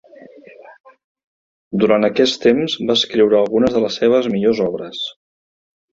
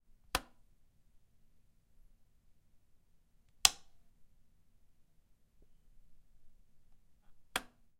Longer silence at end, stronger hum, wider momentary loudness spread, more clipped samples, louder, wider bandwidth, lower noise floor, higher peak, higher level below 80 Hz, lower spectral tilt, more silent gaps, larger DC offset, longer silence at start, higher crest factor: first, 0.8 s vs 0.4 s; neither; about the same, 11 LU vs 12 LU; neither; first, -16 LUFS vs -34 LUFS; second, 7.8 kHz vs 15.5 kHz; second, -42 dBFS vs -68 dBFS; about the same, -2 dBFS vs 0 dBFS; first, -54 dBFS vs -62 dBFS; first, -5 dB/octave vs 0.5 dB/octave; first, 0.80-0.84 s, 1.04-1.15 s, 1.24-1.71 s vs none; neither; second, 0.2 s vs 0.35 s; second, 16 dB vs 44 dB